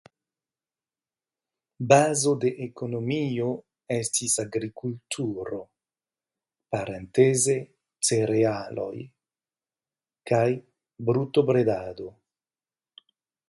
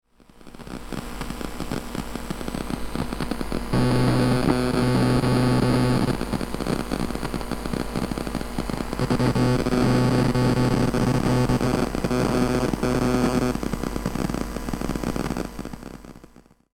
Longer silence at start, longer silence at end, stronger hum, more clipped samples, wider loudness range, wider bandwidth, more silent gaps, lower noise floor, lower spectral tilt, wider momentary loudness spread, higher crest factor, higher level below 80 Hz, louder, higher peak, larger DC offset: first, 1.8 s vs 0.35 s; first, 1.4 s vs 0.55 s; neither; neither; second, 4 LU vs 7 LU; second, 11.5 kHz vs 16.5 kHz; neither; first, under -90 dBFS vs -51 dBFS; second, -4.5 dB/octave vs -6.5 dB/octave; first, 16 LU vs 12 LU; first, 24 dB vs 18 dB; second, -64 dBFS vs -36 dBFS; about the same, -25 LUFS vs -24 LUFS; about the same, -4 dBFS vs -6 dBFS; neither